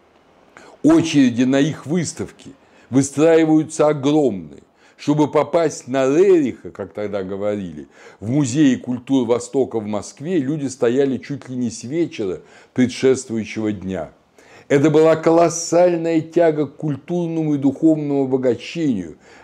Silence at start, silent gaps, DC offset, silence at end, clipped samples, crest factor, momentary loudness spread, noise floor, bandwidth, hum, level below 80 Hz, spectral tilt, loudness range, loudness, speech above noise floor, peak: 0.85 s; none; under 0.1%; 0.3 s; under 0.1%; 16 dB; 13 LU; -52 dBFS; 11 kHz; none; -58 dBFS; -6 dB/octave; 4 LU; -18 LUFS; 35 dB; -2 dBFS